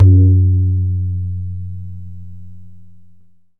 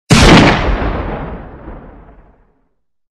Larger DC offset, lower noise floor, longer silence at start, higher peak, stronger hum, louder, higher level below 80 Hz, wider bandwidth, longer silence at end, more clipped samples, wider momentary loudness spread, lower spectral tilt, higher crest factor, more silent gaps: first, 3% vs under 0.1%; second, -48 dBFS vs -65 dBFS; about the same, 0 s vs 0.1 s; about the same, 0 dBFS vs 0 dBFS; neither; second, -15 LUFS vs -10 LUFS; second, -38 dBFS vs -20 dBFS; second, 0.6 kHz vs 14 kHz; second, 0 s vs 1.2 s; neither; about the same, 24 LU vs 26 LU; first, -14 dB/octave vs -5 dB/octave; about the same, 14 dB vs 14 dB; neither